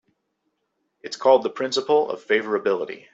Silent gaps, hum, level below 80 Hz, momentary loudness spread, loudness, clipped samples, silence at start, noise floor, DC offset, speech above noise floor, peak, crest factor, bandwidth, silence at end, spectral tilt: none; none; -72 dBFS; 9 LU; -22 LUFS; under 0.1%; 1.05 s; -75 dBFS; under 0.1%; 53 dB; -4 dBFS; 20 dB; 8 kHz; 0.15 s; -3.5 dB/octave